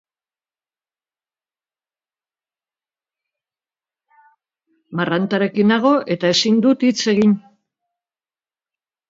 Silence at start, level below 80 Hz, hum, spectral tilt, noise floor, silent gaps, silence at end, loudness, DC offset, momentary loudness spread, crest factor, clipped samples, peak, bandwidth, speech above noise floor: 4.9 s; -66 dBFS; none; -5 dB/octave; under -90 dBFS; none; 1.7 s; -17 LUFS; under 0.1%; 7 LU; 20 dB; under 0.1%; -2 dBFS; 7.8 kHz; over 74 dB